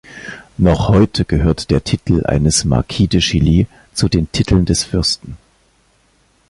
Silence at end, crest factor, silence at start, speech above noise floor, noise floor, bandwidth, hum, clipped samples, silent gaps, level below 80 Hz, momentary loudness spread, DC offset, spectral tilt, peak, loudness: 1.15 s; 14 dB; 0.1 s; 42 dB; -56 dBFS; 11.5 kHz; none; under 0.1%; none; -26 dBFS; 8 LU; under 0.1%; -5.5 dB/octave; 0 dBFS; -15 LUFS